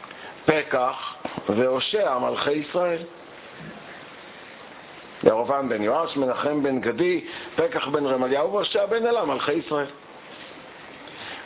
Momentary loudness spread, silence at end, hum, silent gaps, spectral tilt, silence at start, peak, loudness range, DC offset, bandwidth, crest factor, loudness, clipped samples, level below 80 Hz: 19 LU; 0 s; none; none; -9 dB/octave; 0 s; 0 dBFS; 4 LU; under 0.1%; 4 kHz; 24 dB; -24 LUFS; under 0.1%; -62 dBFS